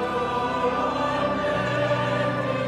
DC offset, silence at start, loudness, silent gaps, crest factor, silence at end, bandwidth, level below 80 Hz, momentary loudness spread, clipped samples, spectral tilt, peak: under 0.1%; 0 s; -24 LUFS; none; 12 dB; 0 s; 12.5 kHz; -50 dBFS; 2 LU; under 0.1%; -6 dB/octave; -12 dBFS